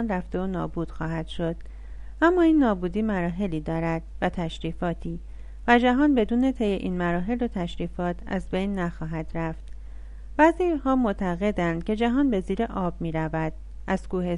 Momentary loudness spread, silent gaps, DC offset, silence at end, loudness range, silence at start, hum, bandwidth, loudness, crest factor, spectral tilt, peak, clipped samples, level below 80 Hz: 14 LU; none; under 0.1%; 0 s; 4 LU; 0 s; none; 10.5 kHz; -26 LUFS; 20 dB; -7.5 dB/octave; -4 dBFS; under 0.1%; -38 dBFS